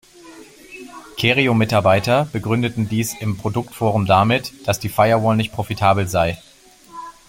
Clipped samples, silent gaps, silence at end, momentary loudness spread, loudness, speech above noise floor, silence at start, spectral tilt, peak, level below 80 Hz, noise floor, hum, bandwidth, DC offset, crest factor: under 0.1%; none; 0.15 s; 21 LU; -18 LUFS; 27 dB; 0.25 s; -5.5 dB/octave; -2 dBFS; -48 dBFS; -44 dBFS; none; 16.5 kHz; under 0.1%; 18 dB